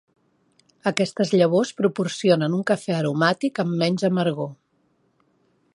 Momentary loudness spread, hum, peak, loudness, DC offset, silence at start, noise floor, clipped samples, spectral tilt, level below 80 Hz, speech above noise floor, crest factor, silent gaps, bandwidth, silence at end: 6 LU; none; -2 dBFS; -22 LUFS; under 0.1%; 0.85 s; -66 dBFS; under 0.1%; -6 dB/octave; -70 dBFS; 45 dB; 22 dB; none; 11.5 kHz; 1.2 s